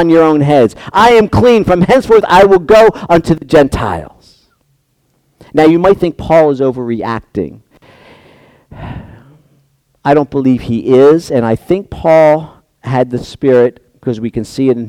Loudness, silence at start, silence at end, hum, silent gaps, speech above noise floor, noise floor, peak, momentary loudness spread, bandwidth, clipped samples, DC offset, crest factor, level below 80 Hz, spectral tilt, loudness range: -10 LUFS; 0 s; 0 s; none; none; 49 dB; -59 dBFS; 0 dBFS; 13 LU; 15 kHz; 0.3%; under 0.1%; 10 dB; -36 dBFS; -7 dB/octave; 10 LU